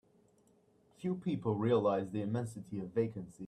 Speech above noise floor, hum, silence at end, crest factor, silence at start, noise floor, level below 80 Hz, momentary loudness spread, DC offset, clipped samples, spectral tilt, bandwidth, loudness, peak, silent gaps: 34 dB; none; 0 s; 18 dB; 1 s; -69 dBFS; -72 dBFS; 11 LU; under 0.1%; under 0.1%; -8 dB/octave; 12.5 kHz; -36 LUFS; -20 dBFS; none